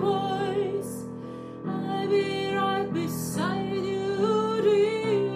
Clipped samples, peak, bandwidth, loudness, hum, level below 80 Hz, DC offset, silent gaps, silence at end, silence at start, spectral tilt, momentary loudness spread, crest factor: under 0.1%; -12 dBFS; 15.5 kHz; -27 LUFS; none; -60 dBFS; under 0.1%; none; 0 s; 0 s; -5.5 dB/octave; 12 LU; 14 dB